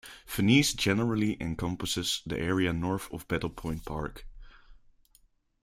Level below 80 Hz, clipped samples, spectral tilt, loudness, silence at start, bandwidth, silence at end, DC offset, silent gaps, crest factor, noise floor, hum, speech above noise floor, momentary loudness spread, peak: -50 dBFS; under 0.1%; -4.5 dB/octave; -29 LUFS; 0.05 s; 16.5 kHz; 0.9 s; under 0.1%; none; 22 dB; -66 dBFS; none; 36 dB; 14 LU; -10 dBFS